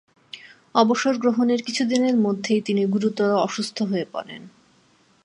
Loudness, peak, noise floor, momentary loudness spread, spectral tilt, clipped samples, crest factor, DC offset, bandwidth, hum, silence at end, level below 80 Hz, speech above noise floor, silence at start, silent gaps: -22 LUFS; -4 dBFS; -59 dBFS; 21 LU; -5 dB/octave; under 0.1%; 18 dB; under 0.1%; 11 kHz; none; 0.75 s; -74 dBFS; 38 dB; 0.35 s; none